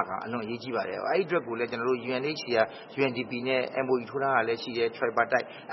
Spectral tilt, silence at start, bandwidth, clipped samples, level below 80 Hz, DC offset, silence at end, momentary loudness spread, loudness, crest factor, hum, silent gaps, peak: -6 dB/octave; 0 s; 6 kHz; under 0.1%; -74 dBFS; under 0.1%; 0 s; 6 LU; -29 LUFS; 20 dB; none; none; -10 dBFS